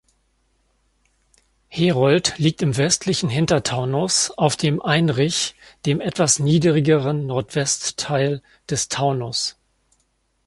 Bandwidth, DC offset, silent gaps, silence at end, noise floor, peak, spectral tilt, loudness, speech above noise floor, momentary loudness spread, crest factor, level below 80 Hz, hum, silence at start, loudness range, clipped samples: 11.5 kHz; under 0.1%; none; 0.95 s; -67 dBFS; -2 dBFS; -4.5 dB/octave; -20 LUFS; 47 dB; 7 LU; 20 dB; -54 dBFS; none; 1.7 s; 3 LU; under 0.1%